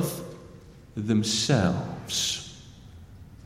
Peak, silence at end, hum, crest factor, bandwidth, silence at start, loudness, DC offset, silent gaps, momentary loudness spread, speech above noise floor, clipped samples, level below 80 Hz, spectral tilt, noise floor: -10 dBFS; 0 s; none; 20 dB; 16.5 kHz; 0 s; -26 LUFS; under 0.1%; none; 24 LU; 23 dB; under 0.1%; -54 dBFS; -4 dB/octave; -48 dBFS